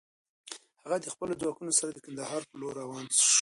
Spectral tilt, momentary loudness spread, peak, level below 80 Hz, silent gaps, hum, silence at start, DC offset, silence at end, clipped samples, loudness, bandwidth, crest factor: -1 dB/octave; 20 LU; -10 dBFS; -74 dBFS; none; none; 0.45 s; under 0.1%; 0 s; under 0.1%; -30 LUFS; 12 kHz; 22 dB